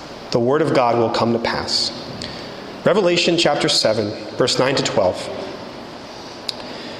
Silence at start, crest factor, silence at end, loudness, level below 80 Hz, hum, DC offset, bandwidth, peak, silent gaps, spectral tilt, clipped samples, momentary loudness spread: 0 s; 16 dB; 0 s; -18 LUFS; -52 dBFS; none; under 0.1%; 13.5 kHz; -4 dBFS; none; -4 dB/octave; under 0.1%; 16 LU